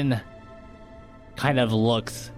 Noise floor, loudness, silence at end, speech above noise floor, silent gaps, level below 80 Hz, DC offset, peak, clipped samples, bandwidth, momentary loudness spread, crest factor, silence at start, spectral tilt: -46 dBFS; -24 LUFS; 0 s; 22 dB; none; -50 dBFS; under 0.1%; -8 dBFS; under 0.1%; 15.5 kHz; 24 LU; 18 dB; 0 s; -6 dB/octave